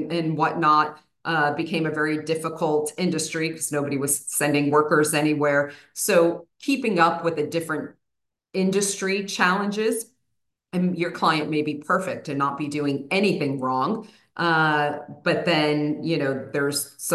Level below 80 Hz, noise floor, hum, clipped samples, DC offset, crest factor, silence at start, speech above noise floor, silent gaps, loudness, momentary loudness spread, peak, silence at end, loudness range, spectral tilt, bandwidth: -72 dBFS; -82 dBFS; none; under 0.1%; under 0.1%; 18 dB; 0 s; 59 dB; none; -23 LUFS; 8 LU; -6 dBFS; 0 s; 3 LU; -4.5 dB/octave; 13 kHz